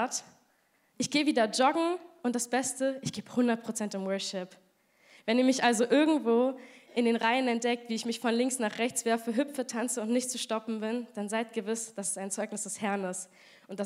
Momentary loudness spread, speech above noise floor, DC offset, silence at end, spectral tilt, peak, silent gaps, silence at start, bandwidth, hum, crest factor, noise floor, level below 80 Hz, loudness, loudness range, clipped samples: 10 LU; 40 dB; under 0.1%; 0 s; -3 dB/octave; -10 dBFS; none; 0 s; 15.5 kHz; none; 20 dB; -70 dBFS; -82 dBFS; -30 LUFS; 5 LU; under 0.1%